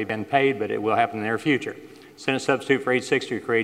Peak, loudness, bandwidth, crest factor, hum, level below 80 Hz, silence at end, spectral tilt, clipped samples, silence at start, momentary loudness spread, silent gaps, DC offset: -6 dBFS; -23 LUFS; 14 kHz; 18 dB; none; -70 dBFS; 0 s; -5 dB/octave; under 0.1%; 0 s; 5 LU; none; under 0.1%